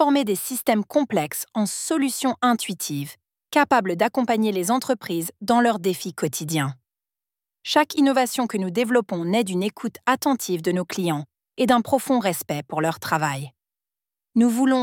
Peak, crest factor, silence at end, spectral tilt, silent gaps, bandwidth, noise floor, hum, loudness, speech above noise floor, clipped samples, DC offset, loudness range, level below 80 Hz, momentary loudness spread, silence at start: -4 dBFS; 20 dB; 0 s; -4.5 dB/octave; none; 18 kHz; under -90 dBFS; none; -23 LUFS; over 68 dB; under 0.1%; under 0.1%; 2 LU; -66 dBFS; 8 LU; 0 s